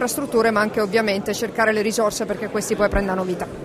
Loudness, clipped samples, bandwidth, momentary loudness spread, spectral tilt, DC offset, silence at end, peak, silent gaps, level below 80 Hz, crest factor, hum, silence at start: -21 LUFS; under 0.1%; 16 kHz; 6 LU; -4 dB/octave; under 0.1%; 0 s; -6 dBFS; none; -38 dBFS; 14 dB; none; 0 s